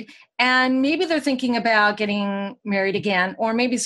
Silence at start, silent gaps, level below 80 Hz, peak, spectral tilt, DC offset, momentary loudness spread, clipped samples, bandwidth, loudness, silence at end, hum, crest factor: 0 s; none; -70 dBFS; -4 dBFS; -4 dB/octave; under 0.1%; 7 LU; under 0.1%; 12 kHz; -20 LUFS; 0 s; none; 18 dB